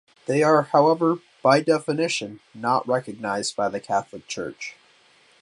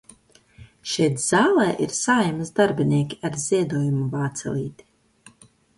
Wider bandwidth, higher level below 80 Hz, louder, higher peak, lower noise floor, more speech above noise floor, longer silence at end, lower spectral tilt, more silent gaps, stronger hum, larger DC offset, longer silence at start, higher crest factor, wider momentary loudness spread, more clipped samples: about the same, 11.5 kHz vs 11.5 kHz; second, -68 dBFS vs -58 dBFS; about the same, -22 LUFS vs -22 LUFS; about the same, -4 dBFS vs -6 dBFS; about the same, -57 dBFS vs -54 dBFS; about the same, 35 dB vs 33 dB; second, 0.7 s vs 1.05 s; about the same, -5 dB/octave vs -5 dB/octave; neither; neither; neither; second, 0.3 s vs 0.6 s; about the same, 20 dB vs 18 dB; first, 14 LU vs 10 LU; neither